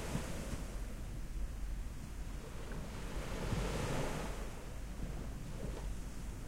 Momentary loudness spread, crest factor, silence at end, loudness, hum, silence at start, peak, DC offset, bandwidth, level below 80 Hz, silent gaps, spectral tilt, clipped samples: 9 LU; 18 dB; 0 s; -44 LUFS; none; 0 s; -24 dBFS; under 0.1%; 16 kHz; -44 dBFS; none; -5 dB/octave; under 0.1%